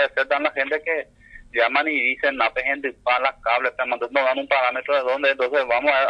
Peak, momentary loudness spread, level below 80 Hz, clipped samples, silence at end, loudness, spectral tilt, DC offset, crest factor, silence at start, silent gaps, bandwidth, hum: -6 dBFS; 5 LU; -56 dBFS; under 0.1%; 0 s; -21 LUFS; -4 dB/octave; under 0.1%; 16 dB; 0 s; none; 6.8 kHz; 50 Hz at -65 dBFS